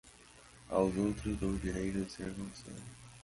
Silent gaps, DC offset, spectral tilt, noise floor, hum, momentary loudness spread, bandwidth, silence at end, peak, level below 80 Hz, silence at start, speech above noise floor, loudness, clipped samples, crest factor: none; under 0.1%; -6.5 dB/octave; -58 dBFS; none; 24 LU; 11.5 kHz; 0 s; -16 dBFS; -50 dBFS; 0.05 s; 22 dB; -36 LUFS; under 0.1%; 20 dB